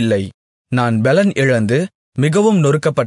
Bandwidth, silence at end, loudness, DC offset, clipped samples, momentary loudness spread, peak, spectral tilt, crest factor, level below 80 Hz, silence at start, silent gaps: 11 kHz; 0 s; -15 LUFS; under 0.1%; under 0.1%; 8 LU; -2 dBFS; -6.5 dB/octave; 12 dB; -58 dBFS; 0 s; 0.34-0.65 s, 1.95-2.12 s